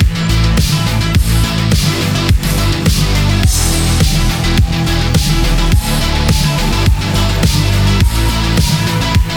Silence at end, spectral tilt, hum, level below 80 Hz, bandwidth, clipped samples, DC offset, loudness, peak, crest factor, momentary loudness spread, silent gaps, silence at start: 0 s; -4.5 dB/octave; none; -16 dBFS; over 20 kHz; under 0.1%; under 0.1%; -13 LUFS; 0 dBFS; 10 dB; 2 LU; none; 0 s